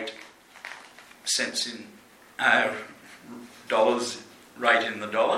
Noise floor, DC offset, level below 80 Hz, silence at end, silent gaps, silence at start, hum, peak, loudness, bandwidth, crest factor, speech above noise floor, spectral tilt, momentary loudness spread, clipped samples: -49 dBFS; under 0.1%; -76 dBFS; 0 s; none; 0 s; none; -6 dBFS; -25 LUFS; 15.5 kHz; 22 dB; 23 dB; -1.5 dB/octave; 22 LU; under 0.1%